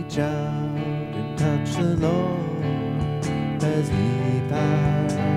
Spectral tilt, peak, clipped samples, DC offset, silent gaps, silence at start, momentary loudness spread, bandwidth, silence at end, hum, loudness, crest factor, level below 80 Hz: -7.5 dB/octave; -8 dBFS; under 0.1%; under 0.1%; none; 0 s; 5 LU; 11.5 kHz; 0 s; none; -24 LUFS; 14 dB; -44 dBFS